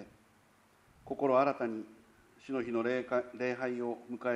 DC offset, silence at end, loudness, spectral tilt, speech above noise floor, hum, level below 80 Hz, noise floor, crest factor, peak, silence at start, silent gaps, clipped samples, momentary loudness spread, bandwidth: under 0.1%; 0 s; -34 LUFS; -7 dB/octave; 33 dB; none; -74 dBFS; -66 dBFS; 20 dB; -16 dBFS; 0 s; none; under 0.1%; 15 LU; 11.5 kHz